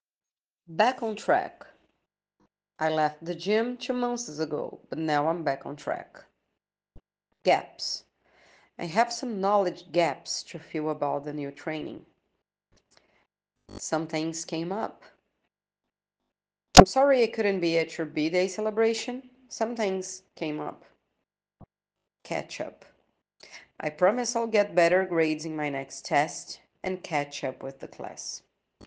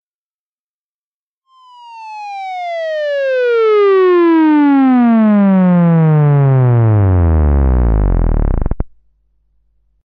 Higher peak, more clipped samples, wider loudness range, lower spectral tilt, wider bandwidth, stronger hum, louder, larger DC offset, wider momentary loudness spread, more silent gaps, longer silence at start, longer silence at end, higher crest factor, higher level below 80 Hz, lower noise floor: about the same, 0 dBFS vs -2 dBFS; neither; first, 12 LU vs 9 LU; second, -4 dB/octave vs -10.5 dB/octave; first, 10.5 kHz vs 6 kHz; neither; second, -27 LUFS vs -11 LUFS; neither; about the same, 15 LU vs 14 LU; neither; second, 0.7 s vs 1.85 s; second, 0 s vs 1.2 s; first, 28 dB vs 10 dB; second, -48 dBFS vs -20 dBFS; about the same, -88 dBFS vs under -90 dBFS